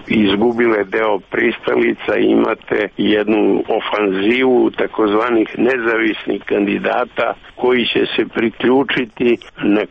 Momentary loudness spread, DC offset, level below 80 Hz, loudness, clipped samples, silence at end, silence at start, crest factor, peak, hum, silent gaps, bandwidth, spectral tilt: 5 LU; under 0.1%; -50 dBFS; -16 LUFS; under 0.1%; 0.05 s; 0 s; 12 dB; -4 dBFS; none; none; 5.8 kHz; -7.5 dB/octave